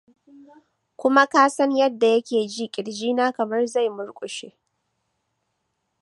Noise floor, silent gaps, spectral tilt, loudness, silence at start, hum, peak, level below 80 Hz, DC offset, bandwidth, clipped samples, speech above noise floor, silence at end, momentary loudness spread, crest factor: -75 dBFS; none; -3.5 dB/octave; -21 LUFS; 1 s; none; -2 dBFS; -80 dBFS; under 0.1%; 11.5 kHz; under 0.1%; 54 dB; 1.55 s; 15 LU; 22 dB